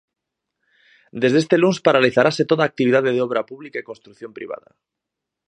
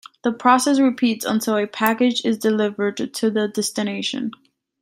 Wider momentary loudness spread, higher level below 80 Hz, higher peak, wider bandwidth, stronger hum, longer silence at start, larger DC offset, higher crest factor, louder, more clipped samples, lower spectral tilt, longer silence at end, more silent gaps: first, 20 LU vs 8 LU; about the same, -66 dBFS vs -68 dBFS; about the same, 0 dBFS vs 0 dBFS; second, 9.6 kHz vs 16 kHz; neither; first, 1.15 s vs 0.25 s; neither; about the same, 20 dB vs 20 dB; first, -17 LUFS vs -20 LUFS; neither; first, -6 dB/octave vs -4 dB/octave; first, 0.9 s vs 0.5 s; neither